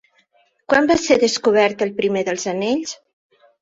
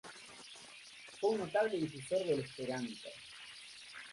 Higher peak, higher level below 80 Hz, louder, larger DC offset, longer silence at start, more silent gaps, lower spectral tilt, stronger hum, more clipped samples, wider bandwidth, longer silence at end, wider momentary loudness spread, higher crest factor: first, -2 dBFS vs -22 dBFS; first, -56 dBFS vs -78 dBFS; first, -18 LUFS vs -37 LUFS; neither; first, 0.7 s vs 0.05 s; neither; about the same, -3.5 dB/octave vs -4.5 dB/octave; neither; neither; second, 7.8 kHz vs 11.5 kHz; first, 0.65 s vs 0 s; second, 8 LU vs 17 LU; about the same, 18 dB vs 18 dB